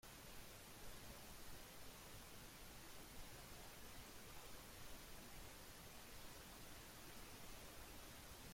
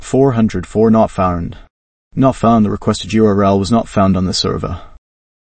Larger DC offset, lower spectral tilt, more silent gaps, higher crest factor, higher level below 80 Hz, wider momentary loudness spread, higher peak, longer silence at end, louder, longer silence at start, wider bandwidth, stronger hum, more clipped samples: neither; second, -3 dB/octave vs -6.5 dB/octave; second, none vs 1.70-2.11 s; about the same, 14 dB vs 14 dB; second, -64 dBFS vs -36 dBFS; second, 1 LU vs 11 LU; second, -42 dBFS vs 0 dBFS; second, 0 s vs 0.45 s; second, -58 LUFS vs -14 LUFS; about the same, 0.05 s vs 0 s; first, 16.5 kHz vs 8.8 kHz; neither; neither